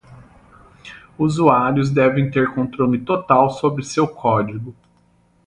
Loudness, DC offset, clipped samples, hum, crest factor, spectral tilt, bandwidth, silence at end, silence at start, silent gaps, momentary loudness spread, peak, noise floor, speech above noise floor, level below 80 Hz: -18 LUFS; under 0.1%; under 0.1%; none; 18 dB; -7 dB/octave; 11 kHz; 0.75 s; 0.1 s; none; 17 LU; 0 dBFS; -57 dBFS; 40 dB; -50 dBFS